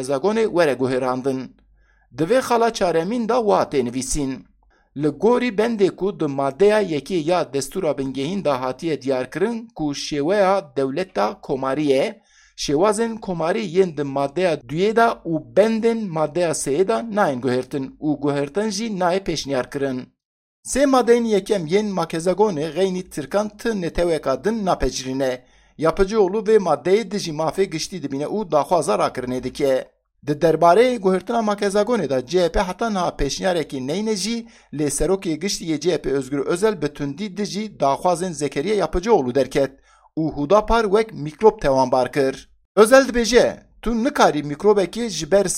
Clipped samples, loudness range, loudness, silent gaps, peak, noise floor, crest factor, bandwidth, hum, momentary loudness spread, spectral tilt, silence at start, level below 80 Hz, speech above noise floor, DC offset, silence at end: under 0.1%; 5 LU; -20 LUFS; 20.25-20.63 s, 42.65-42.75 s; 0 dBFS; -57 dBFS; 20 dB; 15 kHz; none; 9 LU; -5 dB/octave; 0 s; -40 dBFS; 37 dB; under 0.1%; 0 s